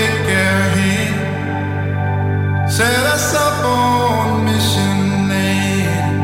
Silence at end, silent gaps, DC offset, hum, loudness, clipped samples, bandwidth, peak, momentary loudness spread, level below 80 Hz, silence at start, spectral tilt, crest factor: 0 s; none; under 0.1%; none; -15 LUFS; under 0.1%; 16.5 kHz; -4 dBFS; 5 LU; -42 dBFS; 0 s; -5 dB/octave; 12 dB